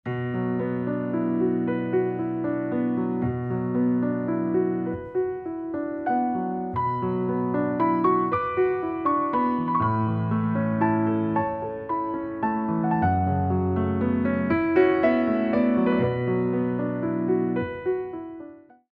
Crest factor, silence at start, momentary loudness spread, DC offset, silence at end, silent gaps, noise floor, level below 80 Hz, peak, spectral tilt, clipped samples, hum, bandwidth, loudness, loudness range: 16 dB; 0.05 s; 7 LU; under 0.1%; 0.4 s; none; -44 dBFS; -54 dBFS; -8 dBFS; -11 dB/octave; under 0.1%; none; 4.9 kHz; -25 LUFS; 4 LU